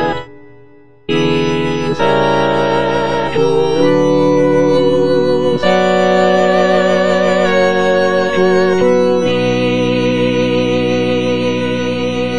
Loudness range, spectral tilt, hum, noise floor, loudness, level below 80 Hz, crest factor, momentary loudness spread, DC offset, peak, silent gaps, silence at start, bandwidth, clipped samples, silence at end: 3 LU; -6 dB/octave; none; -44 dBFS; -13 LUFS; -40 dBFS; 12 dB; 5 LU; 4%; 0 dBFS; none; 0 s; 9.4 kHz; under 0.1%; 0 s